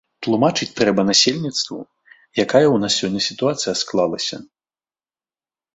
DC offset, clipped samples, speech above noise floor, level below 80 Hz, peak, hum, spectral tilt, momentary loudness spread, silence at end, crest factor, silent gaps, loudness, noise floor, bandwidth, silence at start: under 0.1%; under 0.1%; over 72 dB; -58 dBFS; -2 dBFS; none; -3.5 dB/octave; 11 LU; 1.3 s; 18 dB; none; -18 LUFS; under -90 dBFS; 8.4 kHz; 0.2 s